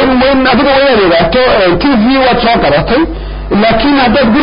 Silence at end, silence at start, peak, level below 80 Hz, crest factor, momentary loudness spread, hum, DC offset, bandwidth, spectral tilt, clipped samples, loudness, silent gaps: 0 s; 0 s; 0 dBFS; -24 dBFS; 8 dB; 4 LU; none; under 0.1%; 5.4 kHz; -10.5 dB/octave; under 0.1%; -8 LUFS; none